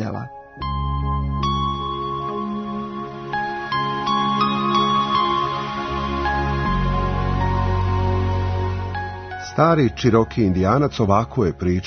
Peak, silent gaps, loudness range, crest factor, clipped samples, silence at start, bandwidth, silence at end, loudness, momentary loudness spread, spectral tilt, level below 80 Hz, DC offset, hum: -2 dBFS; none; 5 LU; 18 dB; under 0.1%; 0 s; 6.6 kHz; 0 s; -21 LUFS; 10 LU; -7 dB/octave; -32 dBFS; under 0.1%; none